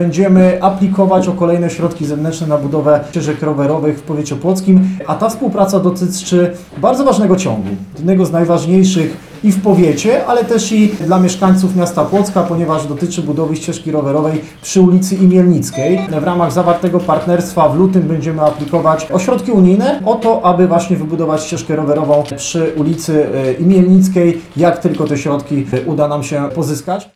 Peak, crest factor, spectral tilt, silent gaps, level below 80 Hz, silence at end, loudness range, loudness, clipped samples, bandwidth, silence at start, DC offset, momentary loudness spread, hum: -2 dBFS; 10 dB; -7 dB/octave; none; -46 dBFS; 0.1 s; 2 LU; -13 LUFS; under 0.1%; 14 kHz; 0 s; under 0.1%; 7 LU; none